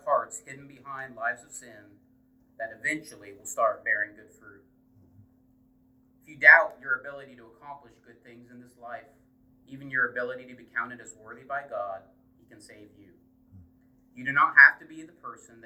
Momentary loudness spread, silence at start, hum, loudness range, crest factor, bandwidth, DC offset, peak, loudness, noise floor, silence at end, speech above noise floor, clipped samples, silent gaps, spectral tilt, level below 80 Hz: 29 LU; 0.05 s; none; 14 LU; 26 dB; 16 kHz; under 0.1%; -2 dBFS; -23 LUFS; -63 dBFS; 0.3 s; 35 dB; under 0.1%; none; -3 dB/octave; -72 dBFS